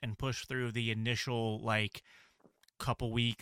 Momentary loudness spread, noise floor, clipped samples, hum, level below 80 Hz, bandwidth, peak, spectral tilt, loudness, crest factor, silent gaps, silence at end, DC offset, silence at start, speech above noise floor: 6 LU; -68 dBFS; under 0.1%; none; -58 dBFS; 15 kHz; -18 dBFS; -5 dB/octave; -35 LUFS; 18 dB; none; 0.05 s; under 0.1%; 0 s; 33 dB